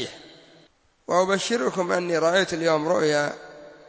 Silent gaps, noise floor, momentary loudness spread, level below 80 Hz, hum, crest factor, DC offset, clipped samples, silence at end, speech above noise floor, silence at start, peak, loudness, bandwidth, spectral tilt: none; -59 dBFS; 15 LU; -66 dBFS; none; 18 dB; under 0.1%; under 0.1%; 0.15 s; 37 dB; 0 s; -8 dBFS; -23 LUFS; 8 kHz; -4 dB/octave